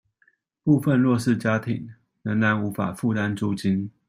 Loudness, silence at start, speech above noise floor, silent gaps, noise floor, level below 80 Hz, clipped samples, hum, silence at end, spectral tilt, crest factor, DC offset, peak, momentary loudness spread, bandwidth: -23 LUFS; 0.65 s; 43 dB; none; -65 dBFS; -62 dBFS; under 0.1%; none; 0.2 s; -7.5 dB/octave; 16 dB; under 0.1%; -8 dBFS; 10 LU; 16 kHz